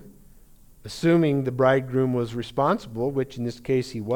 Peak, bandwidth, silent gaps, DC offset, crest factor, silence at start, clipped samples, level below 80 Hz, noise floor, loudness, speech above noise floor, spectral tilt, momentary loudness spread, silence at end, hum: -8 dBFS; 18.5 kHz; none; under 0.1%; 18 dB; 0 s; under 0.1%; -52 dBFS; -50 dBFS; -24 LUFS; 27 dB; -7 dB/octave; 8 LU; 0 s; none